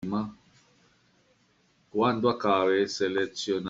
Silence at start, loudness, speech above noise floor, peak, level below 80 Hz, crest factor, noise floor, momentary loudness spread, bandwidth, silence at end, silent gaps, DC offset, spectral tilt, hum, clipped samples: 0 s; -27 LUFS; 40 dB; -10 dBFS; -68 dBFS; 18 dB; -66 dBFS; 9 LU; 7.8 kHz; 0 s; none; under 0.1%; -5 dB/octave; none; under 0.1%